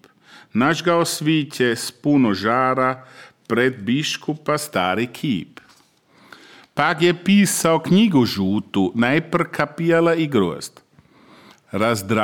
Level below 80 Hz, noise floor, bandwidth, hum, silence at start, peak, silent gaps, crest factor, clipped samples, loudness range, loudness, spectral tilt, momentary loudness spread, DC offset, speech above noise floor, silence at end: -62 dBFS; -55 dBFS; 18 kHz; none; 0.55 s; -2 dBFS; none; 18 dB; under 0.1%; 5 LU; -19 LUFS; -5 dB/octave; 9 LU; under 0.1%; 36 dB; 0 s